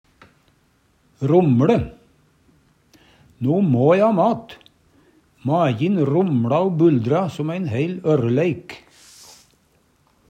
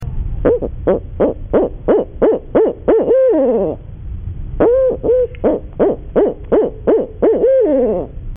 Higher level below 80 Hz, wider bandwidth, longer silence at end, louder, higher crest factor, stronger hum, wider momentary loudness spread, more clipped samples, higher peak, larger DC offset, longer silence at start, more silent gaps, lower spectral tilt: second, -54 dBFS vs -28 dBFS; first, 10.5 kHz vs 3.6 kHz; first, 1.5 s vs 0 s; second, -19 LUFS vs -15 LUFS; first, 18 dB vs 10 dB; neither; about the same, 12 LU vs 10 LU; neither; about the same, -4 dBFS vs -4 dBFS; neither; first, 1.2 s vs 0 s; neither; first, -8.5 dB/octave vs -6 dB/octave